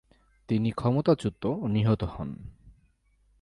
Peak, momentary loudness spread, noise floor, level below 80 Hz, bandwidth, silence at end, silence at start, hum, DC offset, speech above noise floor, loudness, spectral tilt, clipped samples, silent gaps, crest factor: -10 dBFS; 14 LU; -66 dBFS; -50 dBFS; 11 kHz; 0.7 s; 0.5 s; none; under 0.1%; 40 dB; -28 LUFS; -8.5 dB/octave; under 0.1%; none; 18 dB